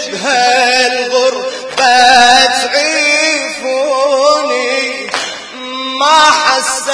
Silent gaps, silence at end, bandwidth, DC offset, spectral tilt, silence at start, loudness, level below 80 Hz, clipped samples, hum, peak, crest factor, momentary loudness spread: none; 0 s; 11 kHz; under 0.1%; 0 dB/octave; 0 s; -10 LUFS; -52 dBFS; 0.5%; none; 0 dBFS; 12 dB; 12 LU